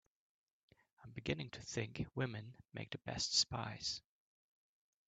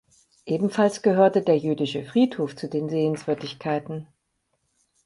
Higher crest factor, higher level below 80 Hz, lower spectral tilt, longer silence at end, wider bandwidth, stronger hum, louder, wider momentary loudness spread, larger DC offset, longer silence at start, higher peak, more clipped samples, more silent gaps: about the same, 24 dB vs 20 dB; about the same, -68 dBFS vs -68 dBFS; second, -3 dB/octave vs -6.5 dB/octave; about the same, 1.1 s vs 1 s; second, 9 kHz vs 11.5 kHz; neither; second, -41 LUFS vs -24 LUFS; first, 17 LU vs 10 LU; neither; first, 1 s vs 0.45 s; second, -20 dBFS vs -6 dBFS; neither; neither